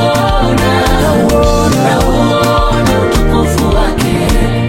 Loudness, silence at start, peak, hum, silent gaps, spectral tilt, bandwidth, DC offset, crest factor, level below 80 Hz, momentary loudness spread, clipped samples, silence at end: -11 LUFS; 0 s; 0 dBFS; none; none; -5.5 dB/octave; 16.5 kHz; under 0.1%; 10 dB; -16 dBFS; 2 LU; under 0.1%; 0 s